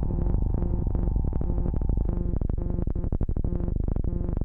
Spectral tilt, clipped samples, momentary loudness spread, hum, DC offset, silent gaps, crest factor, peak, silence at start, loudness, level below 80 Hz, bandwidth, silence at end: -13.5 dB/octave; under 0.1%; 2 LU; none; under 0.1%; none; 12 dB; -12 dBFS; 0 s; -29 LUFS; -28 dBFS; 2 kHz; 0 s